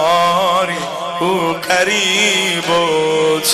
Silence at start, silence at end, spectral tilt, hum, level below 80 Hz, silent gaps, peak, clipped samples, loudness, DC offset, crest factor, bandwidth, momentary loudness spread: 0 s; 0 s; -2.5 dB/octave; none; -56 dBFS; none; 0 dBFS; under 0.1%; -14 LUFS; under 0.1%; 14 dB; 14.5 kHz; 7 LU